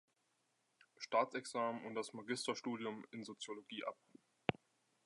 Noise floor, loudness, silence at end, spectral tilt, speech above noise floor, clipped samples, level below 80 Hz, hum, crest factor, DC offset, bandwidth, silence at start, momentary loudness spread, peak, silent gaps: -82 dBFS; -43 LUFS; 0.55 s; -4 dB/octave; 39 dB; under 0.1%; -80 dBFS; none; 30 dB; under 0.1%; 11.5 kHz; 1 s; 13 LU; -14 dBFS; none